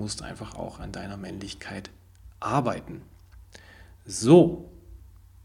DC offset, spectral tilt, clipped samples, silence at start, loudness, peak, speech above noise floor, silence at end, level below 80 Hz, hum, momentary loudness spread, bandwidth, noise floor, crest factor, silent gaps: under 0.1%; -6 dB/octave; under 0.1%; 0 s; -25 LUFS; -4 dBFS; 25 dB; 0.35 s; -50 dBFS; none; 24 LU; 12.5 kHz; -50 dBFS; 24 dB; none